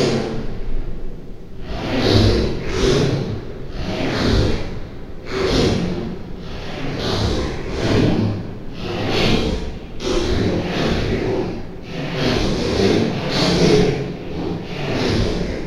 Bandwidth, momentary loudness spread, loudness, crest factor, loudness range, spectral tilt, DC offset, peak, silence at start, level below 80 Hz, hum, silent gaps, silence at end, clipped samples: 12.5 kHz; 15 LU; -20 LUFS; 18 dB; 3 LU; -6 dB/octave; under 0.1%; -2 dBFS; 0 s; -28 dBFS; none; none; 0 s; under 0.1%